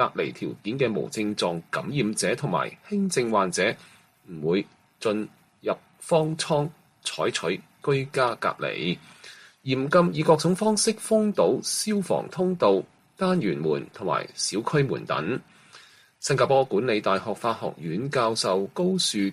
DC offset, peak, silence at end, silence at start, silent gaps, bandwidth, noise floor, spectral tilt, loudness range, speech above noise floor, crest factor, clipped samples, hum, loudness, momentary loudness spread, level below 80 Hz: under 0.1%; -6 dBFS; 0 s; 0 s; none; 15 kHz; -52 dBFS; -4.5 dB/octave; 4 LU; 27 dB; 20 dB; under 0.1%; none; -25 LUFS; 11 LU; -66 dBFS